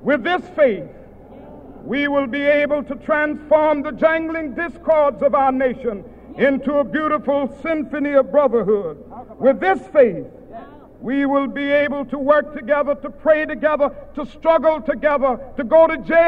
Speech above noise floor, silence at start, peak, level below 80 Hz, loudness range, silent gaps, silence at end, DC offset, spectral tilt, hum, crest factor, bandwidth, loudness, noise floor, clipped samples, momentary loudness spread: 22 dB; 0 s; -2 dBFS; -46 dBFS; 2 LU; none; 0 s; under 0.1%; -7.5 dB/octave; none; 16 dB; 5.4 kHz; -18 LUFS; -40 dBFS; under 0.1%; 13 LU